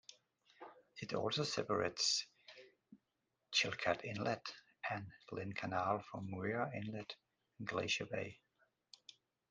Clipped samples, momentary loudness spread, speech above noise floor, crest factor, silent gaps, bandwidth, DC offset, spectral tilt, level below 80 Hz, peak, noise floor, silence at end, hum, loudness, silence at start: under 0.1%; 24 LU; 46 dB; 24 dB; none; 10 kHz; under 0.1%; -3 dB/octave; -78 dBFS; -20 dBFS; -87 dBFS; 1.15 s; none; -40 LUFS; 0.1 s